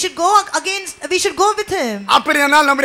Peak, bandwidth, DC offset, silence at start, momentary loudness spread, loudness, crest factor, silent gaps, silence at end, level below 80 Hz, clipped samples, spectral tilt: -2 dBFS; 18.5 kHz; under 0.1%; 0 s; 8 LU; -15 LUFS; 14 dB; none; 0 s; -52 dBFS; under 0.1%; -1.5 dB/octave